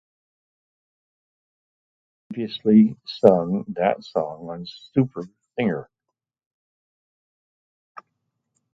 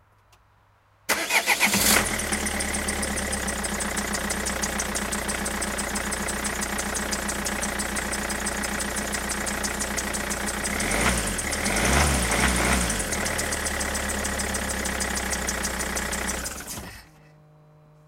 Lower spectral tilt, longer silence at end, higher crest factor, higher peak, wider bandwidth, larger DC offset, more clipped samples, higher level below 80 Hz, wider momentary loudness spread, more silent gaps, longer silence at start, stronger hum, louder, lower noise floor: first, -8.5 dB/octave vs -2.5 dB/octave; first, 2.9 s vs 1 s; about the same, 24 dB vs 22 dB; first, 0 dBFS vs -4 dBFS; second, 6 kHz vs 17 kHz; neither; neither; second, -64 dBFS vs -36 dBFS; first, 18 LU vs 6 LU; neither; first, 2.3 s vs 1.1 s; neither; first, -22 LUFS vs -25 LUFS; first, -83 dBFS vs -60 dBFS